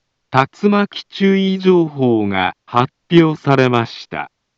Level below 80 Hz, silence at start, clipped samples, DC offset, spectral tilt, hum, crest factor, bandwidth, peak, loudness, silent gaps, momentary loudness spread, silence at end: -60 dBFS; 0.3 s; under 0.1%; under 0.1%; -7.5 dB/octave; none; 16 dB; 7.4 kHz; 0 dBFS; -15 LUFS; none; 9 LU; 0.3 s